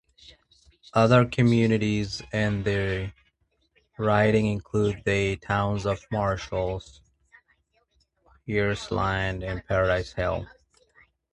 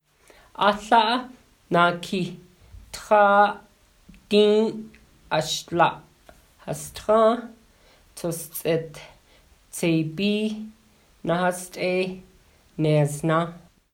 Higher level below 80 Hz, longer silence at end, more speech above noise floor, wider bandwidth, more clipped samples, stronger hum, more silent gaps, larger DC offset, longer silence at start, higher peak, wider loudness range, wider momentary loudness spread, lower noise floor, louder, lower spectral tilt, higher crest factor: first, -46 dBFS vs -56 dBFS; first, 0.85 s vs 0.35 s; first, 45 dB vs 34 dB; second, 10.5 kHz vs 17 kHz; neither; neither; neither; neither; first, 0.95 s vs 0.6 s; about the same, -6 dBFS vs -4 dBFS; about the same, 6 LU vs 6 LU; second, 10 LU vs 21 LU; first, -70 dBFS vs -56 dBFS; about the same, -25 LUFS vs -23 LUFS; first, -6.5 dB/octave vs -5 dB/octave; about the same, 20 dB vs 20 dB